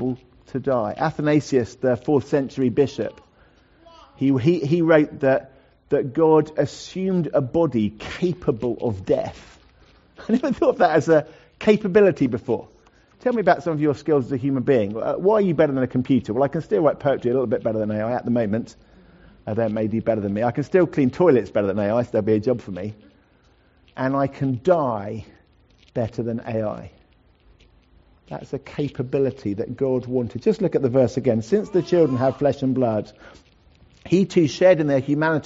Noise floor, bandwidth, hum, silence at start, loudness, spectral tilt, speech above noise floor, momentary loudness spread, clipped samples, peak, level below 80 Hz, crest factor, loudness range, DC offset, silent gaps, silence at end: -57 dBFS; 8 kHz; none; 0 s; -21 LUFS; -7 dB/octave; 37 dB; 11 LU; under 0.1%; -2 dBFS; -54 dBFS; 18 dB; 6 LU; under 0.1%; none; 0 s